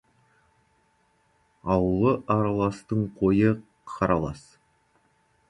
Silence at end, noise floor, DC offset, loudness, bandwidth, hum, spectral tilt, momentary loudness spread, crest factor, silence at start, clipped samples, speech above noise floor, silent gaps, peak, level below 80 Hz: 1.1 s; -67 dBFS; under 0.1%; -25 LUFS; 11 kHz; none; -9 dB/octave; 13 LU; 18 dB; 1.65 s; under 0.1%; 43 dB; none; -8 dBFS; -48 dBFS